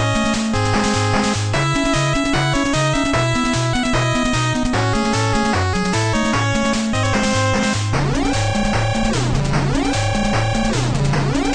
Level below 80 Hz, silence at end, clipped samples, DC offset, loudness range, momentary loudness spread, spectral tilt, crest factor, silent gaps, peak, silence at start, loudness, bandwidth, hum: -28 dBFS; 0 s; under 0.1%; under 0.1%; 1 LU; 2 LU; -5 dB/octave; 14 dB; none; -4 dBFS; 0 s; -18 LUFS; 10.5 kHz; none